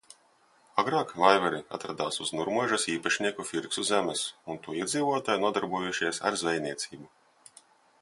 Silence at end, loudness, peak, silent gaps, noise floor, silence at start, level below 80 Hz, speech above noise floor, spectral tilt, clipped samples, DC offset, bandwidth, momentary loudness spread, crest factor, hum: 0.95 s; -29 LUFS; -4 dBFS; none; -64 dBFS; 0.75 s; -70 dBFS; 35 dB; -3 dB/octave; under 0.1%; under 0.1%; 11.5 kHz; 10 LU; 26 dB; none